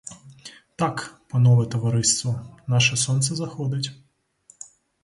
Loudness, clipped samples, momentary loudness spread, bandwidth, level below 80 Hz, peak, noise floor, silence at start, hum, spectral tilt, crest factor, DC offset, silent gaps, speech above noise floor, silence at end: -22 LUFS; under 0.1%; 24 LU; 11.5 kHz; -58 dBFS; -6 dBFS; -57 dBFS; 0.05 s; none; -4 dB/octave; 18 dB; under 0.1%; none; 36 dB; 1.1 s